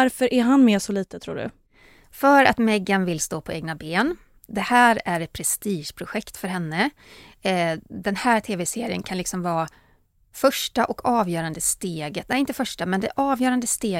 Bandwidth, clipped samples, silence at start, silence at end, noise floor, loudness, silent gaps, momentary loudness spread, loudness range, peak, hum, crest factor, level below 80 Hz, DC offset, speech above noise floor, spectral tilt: 16.5 kHz; under 0.1%; 0 s; 0 s; -60 dBFS; -23 LUFS; none; 14 LU; 5 LU; -2 dBFS; none; 20 dB; -54 dBFS; under 0.1%; 38 dB; -4 dB/octave